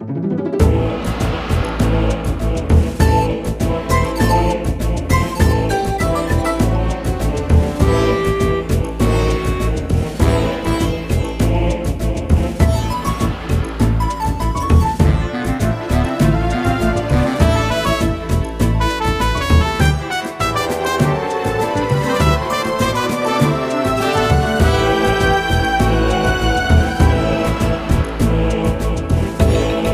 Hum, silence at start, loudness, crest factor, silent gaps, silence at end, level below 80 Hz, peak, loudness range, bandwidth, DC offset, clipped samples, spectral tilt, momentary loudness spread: none; 0 s; -17 LUFS; 16 dB; none; 0 s; -22 dBFS; 0 dBFS; 2 LU; 15.5 kHz; under 0.1%; under 0.1%; -6 dB/octave; 5 LU